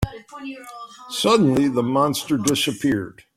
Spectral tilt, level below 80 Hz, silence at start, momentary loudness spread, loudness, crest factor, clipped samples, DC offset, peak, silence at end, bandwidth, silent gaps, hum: -4.5 dB/octave; -46 dBFS; 0 s; 19 LU; -20 LUFS; 18 dB; under 0.1%; under 0.1%; -4 dBFS; 0.25 s; 16 kHz; none; none